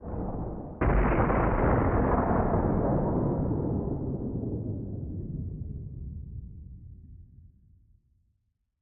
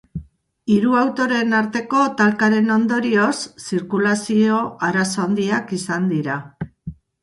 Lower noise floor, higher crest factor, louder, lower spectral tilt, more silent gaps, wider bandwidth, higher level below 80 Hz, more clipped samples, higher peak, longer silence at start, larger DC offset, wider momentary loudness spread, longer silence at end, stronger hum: first, -76 dBFS vs -39 dBFS; about the same, 18 dB vs 16 dB; second, -29 LUFS vs -19 LUFS; first, -10 dB/octave vs -5.5 dB/octave; neither; second, 3.2 kHz vs 11.5 kHz; first, -36 dBFS vs -52 dBFS; neither; second, -12 dBFS vs -4 dBFS; second, 0 s vs 0.15 s; neither; about the same, 17 LU vs 16 LU; first, 1.35 s vs 0.3 s; neither